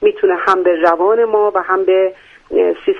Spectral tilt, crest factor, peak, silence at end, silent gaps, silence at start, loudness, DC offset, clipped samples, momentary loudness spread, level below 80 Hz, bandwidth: -5.5 dB/octave; 14 dB; 0 dBFS; 0 s; none; 0 s; -14 LUFS; under 0.1%; under 0.1%; 4 LU; -54 dBFS; 6.6 kHz